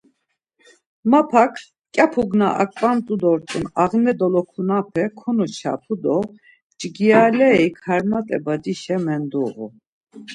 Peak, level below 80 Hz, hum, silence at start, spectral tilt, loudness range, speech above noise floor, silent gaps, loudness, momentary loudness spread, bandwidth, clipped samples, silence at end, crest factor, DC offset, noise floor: -2 dBFS; -58 dBFS; none; 1.05 s; -6.5 dB/octave; 2 LU; 53 dB; 6.62-6.70 s, 9.87-10.01 s; -19 LUFS; 11 LU; 10.5 kHz; under 0.1%; 0 s; 18 dB; under 0.1%; -72 dBFS